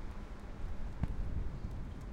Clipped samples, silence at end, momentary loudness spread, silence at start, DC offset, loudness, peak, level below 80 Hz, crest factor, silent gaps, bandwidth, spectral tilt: under 0.1%; 0 s; 8 LU; 0 s; under 0.1%; -44 LUFS; -22 dBFS; -42 dBFS; 18 dB; none; 8.6 kHz; -8 dB/octave